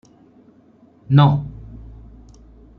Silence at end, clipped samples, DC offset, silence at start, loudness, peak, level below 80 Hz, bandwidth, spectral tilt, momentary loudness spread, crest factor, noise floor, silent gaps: 1.15 s; under 0.1%; under 0.1%; 1.1 s; -16 LUFS; -2 dBFS; -44 dBFS; 4.5 kHz; -9.5 dB/octave; 26 LU; 20 dB; -52 dBFS; none